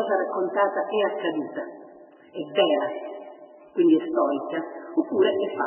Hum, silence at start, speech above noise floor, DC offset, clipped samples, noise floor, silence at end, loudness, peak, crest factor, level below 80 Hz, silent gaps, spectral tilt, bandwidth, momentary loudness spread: none; 0 s; 25 dB; under 0.1%; under 0.1%; -49 dBFS; 0 s; -25 LUFS; -6 dBFS; 18 dB; -80 dBFS; none; -9 dB/octave; 3.2 kHz; 17 LU